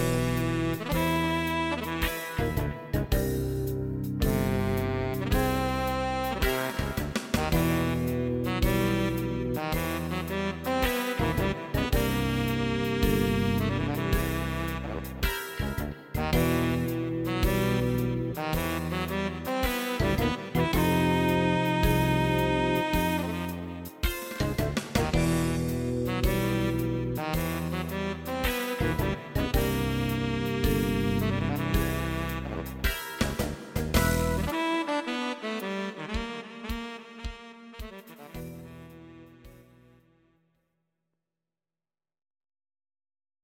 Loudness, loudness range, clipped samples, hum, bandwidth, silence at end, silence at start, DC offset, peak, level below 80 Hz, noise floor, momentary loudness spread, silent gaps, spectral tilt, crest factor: -29 LUFS; 6 LU; under 0.1%; none; 17 kHz; 3.85 s; 0 s; under 0.1%; -10 dBFS; -38 dBFS; under -90 dBFS; 9 LU; none; -5.5 dB/octave; 20 dB